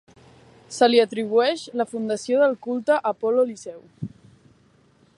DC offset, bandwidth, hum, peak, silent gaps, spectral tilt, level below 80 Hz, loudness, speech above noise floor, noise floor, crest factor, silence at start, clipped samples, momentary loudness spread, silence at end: under 0.1%; 11.5 kHz; none; -4 dBFS; none; -4.5 dB/octave; -68 dBFS; -22 LUFS; 37 dB; -58 dBFS; 18 dB; 0.7 s; under 0.1%; 19 LU; 1.1 s